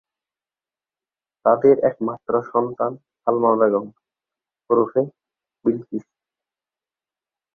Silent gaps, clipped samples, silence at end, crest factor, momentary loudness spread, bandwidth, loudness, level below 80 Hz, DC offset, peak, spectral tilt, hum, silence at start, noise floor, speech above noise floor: none; under 0.1%; 1.55 s; 20 dB; 12 LU; 2.4 kHz; -20 LUFS; -68 dBFS; under 0.1%; -2 dBFS; -11.5 dB/octave; none; 1.45 s; under -90 dBFS; over 71 dB